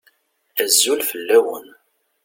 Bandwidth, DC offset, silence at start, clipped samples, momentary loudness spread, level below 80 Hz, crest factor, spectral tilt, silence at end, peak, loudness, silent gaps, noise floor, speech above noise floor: 17 kHz; under 0.1%; 0.55 s; under 0.1%; 12 LU; -74 dBFS; 20 dB; 0.5 dB/octave; 0.6 s; -2 dBFS; -17 LUFS; none; -61 dBFS; 43 dB